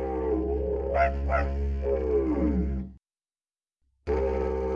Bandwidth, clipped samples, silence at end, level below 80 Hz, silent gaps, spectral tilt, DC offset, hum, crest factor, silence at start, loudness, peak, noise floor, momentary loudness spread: 5.8 kHz; under 0.1%; 0 s; -34 dBFS; none; -9.5 dB/octave; under 0.1%; none; 16 dB; 0 s; -28 LUFS; -12 dBFS; under -90 dBFS; 6 LU